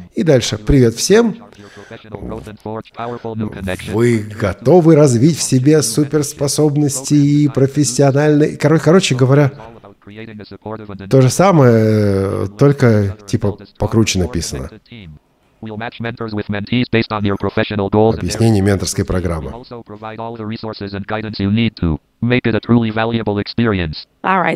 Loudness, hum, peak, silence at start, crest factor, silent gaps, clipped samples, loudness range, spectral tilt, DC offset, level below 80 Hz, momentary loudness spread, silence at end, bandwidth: -14 LUFS; none; 0 dBFS; 0 s; 14 dB; none; under 0.1%; 8 LU; -6 dB/octave; under 0.1%; -36 dBFS; 18 LU; 0 s; 15 kHz